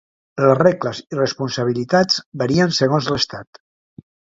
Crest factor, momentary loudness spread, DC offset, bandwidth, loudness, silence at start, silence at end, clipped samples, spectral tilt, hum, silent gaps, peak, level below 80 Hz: 18 dB; 9 LU; under 0.1%; 7.8 kHz; -18 LUFS; 0.35 s; 0.9 s; under 0.1%; -5 dB/octave; none; 2.26-2.32 s; 0 dBFS; -56 dBFS